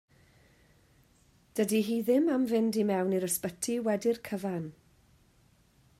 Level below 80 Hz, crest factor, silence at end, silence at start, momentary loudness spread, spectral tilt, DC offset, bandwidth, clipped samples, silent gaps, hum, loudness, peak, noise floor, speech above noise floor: -70 dBFS; 16 dB; 1.3 s; 1.55 s; 9 LU; -5 dB/octave; under 0.1%; 16 kHz; under 0.1%; none; none; -30 LUFS; -16 dBFS; -65 dBFS; 36 dB